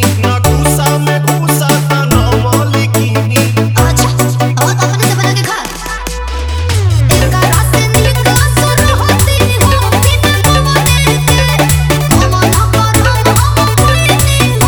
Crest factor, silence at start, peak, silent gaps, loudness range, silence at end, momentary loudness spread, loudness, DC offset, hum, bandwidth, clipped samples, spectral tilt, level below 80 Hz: 10 dB; 0 s; 0 dBFS; none; 3 LU; 0 s; 3 LU; -10 LUFS; 0.3%; none; over 20 kHz; 0.3%; -4.5 dB/octave; -18 dBFS